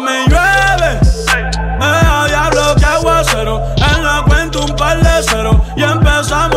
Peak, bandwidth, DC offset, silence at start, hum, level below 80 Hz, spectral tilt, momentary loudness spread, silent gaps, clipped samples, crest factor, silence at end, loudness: 0 dBFS; 16 kHz; under 0.1%; 0 s; none; -16 dBFS; -4.5 dB/octave; 4 LU; none; under 0.1%; 10 dB; 0 s; -11 LUFS